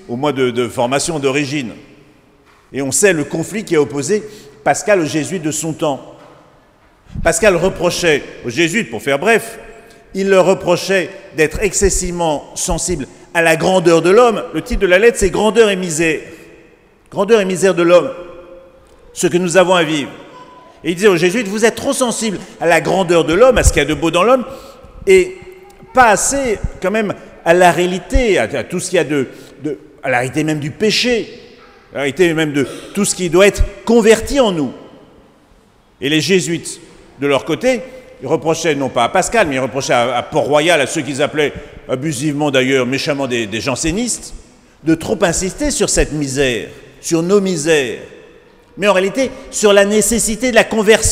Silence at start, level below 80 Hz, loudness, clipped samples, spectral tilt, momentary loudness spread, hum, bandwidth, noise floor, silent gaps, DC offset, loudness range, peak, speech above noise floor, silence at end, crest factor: 0.1 s; -32 dBFS; -14 LUFS; under 0.1%; -4 dB/octave; 12 LU; none; 16 kHz; -49 dBFS; none; under 0.1%; 4 LU; 0 dBFS; 35 dB; 0 s; 16 dB